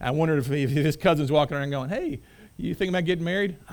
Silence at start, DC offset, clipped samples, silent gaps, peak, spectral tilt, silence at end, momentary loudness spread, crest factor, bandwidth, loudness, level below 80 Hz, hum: 0 s; under 0.1%; under 0.1%; none; -8 dBFS; -7 dB/octave; 0 s; 10 LU; 16 dB; over 20 kHz; -25 LUFS; -50 dBFS; none